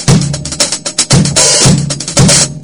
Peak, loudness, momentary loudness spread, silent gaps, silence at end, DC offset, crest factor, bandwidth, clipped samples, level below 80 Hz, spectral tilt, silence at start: 0 dBFS; -8 LUFS; 7 LU; none; 0 s; under 0.1%; 10 dB; over 20 kHz; 0.9%; -30 dBFS; -3.5 dB/octave; 0 s